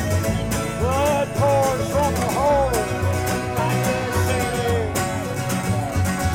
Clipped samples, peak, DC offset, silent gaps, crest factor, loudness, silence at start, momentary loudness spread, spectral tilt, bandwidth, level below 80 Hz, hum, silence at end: under 0.1%; -10 dBFS; under 0.1%; none; 10 dB; -21 LUFS; 0 s; 5 LU; -5.5 dB/octave; 17 kHz; -36 dBFS; none; 0 s